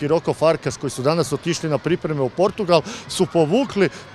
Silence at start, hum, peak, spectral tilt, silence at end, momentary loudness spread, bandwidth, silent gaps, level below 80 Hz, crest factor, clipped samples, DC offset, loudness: 0 s; none; 0 dBFS; -5.5 dB/octave; 0 s; 5 LU; 14 kHz; none; -54 dBFS; 20 dB; under 0.1%; under 0.1%; -20 LUFS